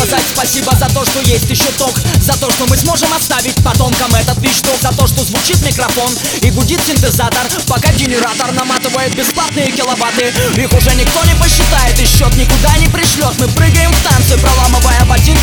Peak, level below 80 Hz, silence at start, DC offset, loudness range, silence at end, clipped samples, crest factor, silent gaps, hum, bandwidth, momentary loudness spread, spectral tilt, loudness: 0 dBFS; -16 dBFS; 0 s; 0.1%; 3 LU; 0 s; 0.5%; 10 dB; none; none; over 20 kHz; 4 LU; -3.5 dB/octave; -10 LUFS